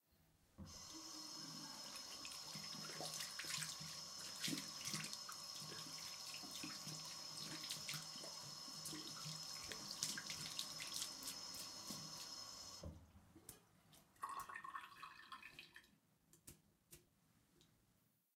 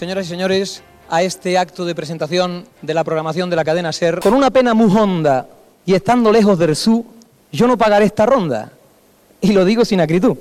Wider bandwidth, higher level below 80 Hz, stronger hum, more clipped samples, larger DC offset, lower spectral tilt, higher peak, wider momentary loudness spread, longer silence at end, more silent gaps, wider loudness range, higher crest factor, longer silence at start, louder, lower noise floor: first, 16 kHz vs 14.5 kHz; second, -78 dBFS vs -48 dBFS; neither; neither; neither; second, -1 dB/octave vs -6 dB/octave; second, -22 dBFS vs -4 dBFS; first, 17 LU vs 10 LU; first, 0.7 s vs 0 s; neither; first, 9 LU vs 5 LU; first, 30 dB vs 12 dB; about the same, 0.1 s vs 0 s; second, -49 LUFS vs -15 LUFS; first, -80 dBFS vs -51 dBFS